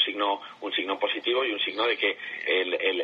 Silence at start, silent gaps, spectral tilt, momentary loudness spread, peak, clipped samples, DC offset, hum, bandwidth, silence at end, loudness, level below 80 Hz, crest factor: 0 s; none; -3.5 dB/octave; 5 LU; -10 dBFS; under 0.1%; under 0.1%; none; 6.8 kHz; 0 s; -26 LUFS; -84 dBFS; 16 dB